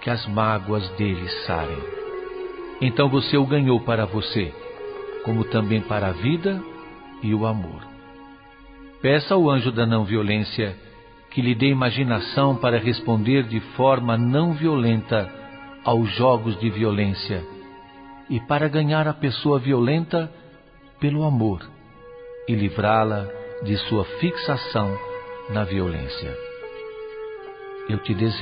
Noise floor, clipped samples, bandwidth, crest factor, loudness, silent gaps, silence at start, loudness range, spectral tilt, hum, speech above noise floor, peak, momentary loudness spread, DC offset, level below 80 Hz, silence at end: -49 dBFS; under 0.1%; 5.2 kHz; 18 dB; -22 LUFS; none; 0 s; 5 LU; -11.5 dB/octave; none; 28 dB; -4 dBFS; 16 LU; under 0.1%; -46 dBFS; 0 s